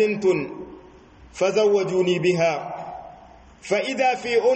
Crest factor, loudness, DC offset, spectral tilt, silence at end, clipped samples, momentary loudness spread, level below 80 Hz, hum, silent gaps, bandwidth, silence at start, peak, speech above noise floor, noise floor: 14 dB; -22 LUFS; under 0.1%; -5 dB/octave; 0 s; under 0.1%; 19 LU; -56 dBFS; none; none; 8.4 kHz; 0 s; -8 dBFS; 27 dB; -48 dBFS